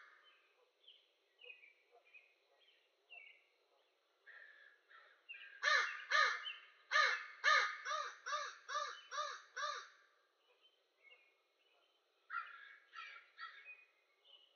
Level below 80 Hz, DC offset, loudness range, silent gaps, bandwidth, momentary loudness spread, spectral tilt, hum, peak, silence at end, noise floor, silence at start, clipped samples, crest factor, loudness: under -90 dBFS; under 0.1%; 18 LU; none; 6.8 kHz; 25 LU; 10 dB/octave; none; -22 dBFS; 0.2 s; -78 dBFS; 0 s; under 0.1%; 24 dB; -38 LUFS